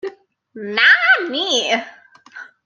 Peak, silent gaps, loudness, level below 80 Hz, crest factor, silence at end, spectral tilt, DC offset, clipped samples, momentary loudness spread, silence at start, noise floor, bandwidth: -2 dBFS; none; -14 LUFS; -78 dBFS; 18 dB; 0.2 s; -1 dB/octave; under 0.1%; under 0.1%; 17 LU; 0.05 s; -40 dBFS; 10 kHz